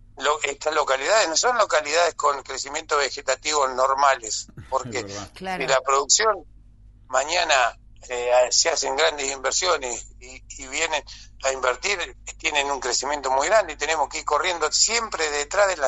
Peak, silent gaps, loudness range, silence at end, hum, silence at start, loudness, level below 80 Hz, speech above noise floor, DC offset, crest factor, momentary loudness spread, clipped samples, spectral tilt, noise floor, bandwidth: -4 dBFS; none; 3 LU; 0 s; none; 0.15 s; -22 LUFS; -50 dBFS; 26 dB; under 0.1%; 20 dB; 11 LU; under 0.1%; -0.5 dB/octave; -49 dBFS; 11.5 kHz